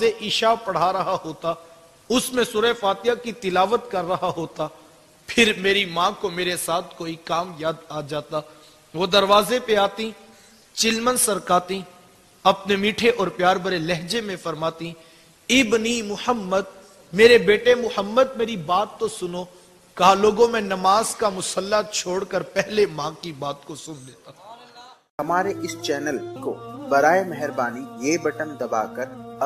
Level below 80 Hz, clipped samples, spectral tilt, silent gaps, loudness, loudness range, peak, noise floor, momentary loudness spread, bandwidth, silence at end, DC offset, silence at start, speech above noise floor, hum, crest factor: -56 dBFS; under 0.1%; -3.5 dB/octave; 25.10-25.18 s; -21 LUFS; 7 LU; 0 dBFS; -52 dBFS; 14 LU; 15.5 kHz; 0 s; under 0.1%; 0 s; 30 dB; none; 22 dB